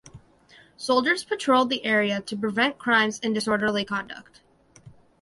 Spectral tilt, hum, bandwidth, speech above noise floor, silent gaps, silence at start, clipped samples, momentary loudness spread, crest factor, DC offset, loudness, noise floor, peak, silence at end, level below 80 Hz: -4 dB/octave; none; 11.5 kHz; 31 dB; none; 0.15 s; under 0.1%; 9 LU; 18 dB; under 0.1%; -24 LUFS; -55 dBFS; -8 dBFS; 0.35 s; -64 dBFS